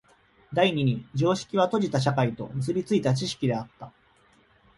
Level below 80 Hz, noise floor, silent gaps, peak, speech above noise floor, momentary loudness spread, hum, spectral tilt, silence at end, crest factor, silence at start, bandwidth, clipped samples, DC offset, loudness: -60 dBFS; -61 dBFS; none; -8 dBFS; 36 dB; 8 LU; none; -6 dB/octave; 0.9 s; 18 dB; 0.5 s; 11.5 kHz; under 0.1%; under 0.1%; -26 LUFS